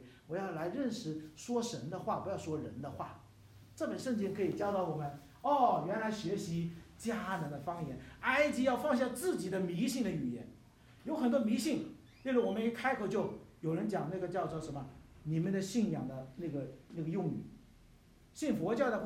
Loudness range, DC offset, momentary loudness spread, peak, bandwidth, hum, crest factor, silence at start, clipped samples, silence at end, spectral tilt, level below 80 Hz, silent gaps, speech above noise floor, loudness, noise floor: 5 LU; under 0.1%; 13 LU; -16 dBFS; 16 kHz; none; 20 dB; 0 s; under 0.1%; 0 s; -6 dB/octave; -66 dBFS; none; 26 dB; -37 LUFS; -62 dBFS